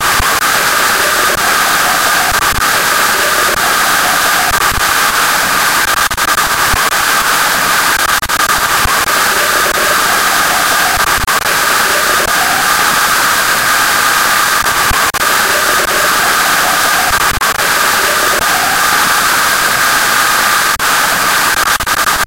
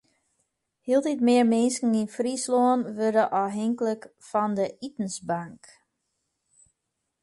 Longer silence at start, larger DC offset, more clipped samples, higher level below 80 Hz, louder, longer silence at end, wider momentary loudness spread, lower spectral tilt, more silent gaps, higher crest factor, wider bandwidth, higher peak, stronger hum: second, 0 s vs 0.85 s; first, 0.6% vs under 0.1%; neither; first, -32 dBFS vs -72 dBFS; first, -9 LUFS vs -25 LUFS; second, 0 s vs 1.7 s; second, 1 LU vs 11 LU; second, -0.5 dB/octave vs -5 dB/octave; neither; second, 10 dB vs 16 dB; first, 17.5 kHz vs 11.5 kHz; first, 0 dBFS vs -10 dBFS; neither